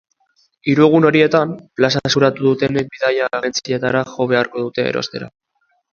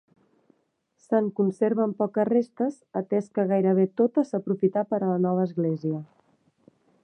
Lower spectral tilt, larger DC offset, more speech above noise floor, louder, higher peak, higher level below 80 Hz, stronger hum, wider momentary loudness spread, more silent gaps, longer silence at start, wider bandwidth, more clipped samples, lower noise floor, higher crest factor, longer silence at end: second, -5.5 dB/octave vs -10 dB/octave; neither; about the same, 49 dB vs 48 dB; first, -16 LUFS vs -25 LUFS; first, 0 dBFS vs -10 dBFS; first, -54 dBFS vs -78 dBFS; neither; first, 11 LU vs 7 LU; neither; second, 0.65 s vs 1.1 s; second, 7.2 kHz vs 9 kHz; neither; second, -65 dBFS vs -72 dBFS; about the same, 16 dB vs 16 dB; second, 0.65 s vs 1 s